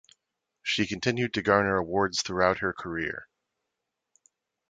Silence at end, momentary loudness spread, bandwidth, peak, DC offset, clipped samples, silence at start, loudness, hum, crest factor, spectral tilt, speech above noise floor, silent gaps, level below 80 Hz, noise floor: 1.45 s; 9 LU; 9.4 kHz; -6 dBFS; under 0.1%; under 0.1%; 0.65 s; -27 LUFS; none; 24 dB; -4 dB/octave; 57 dB; none; -56 dBFS; -84 dBFS